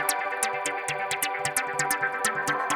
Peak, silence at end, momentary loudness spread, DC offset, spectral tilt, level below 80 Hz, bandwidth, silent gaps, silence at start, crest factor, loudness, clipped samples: -8 dBFS; 0 s; 3 LU; under 0.1%; -1 dB/octave; -68 dBFS; over 20 kHz; none; 0 s; 20 dB; -27 LUFS; under 0.1%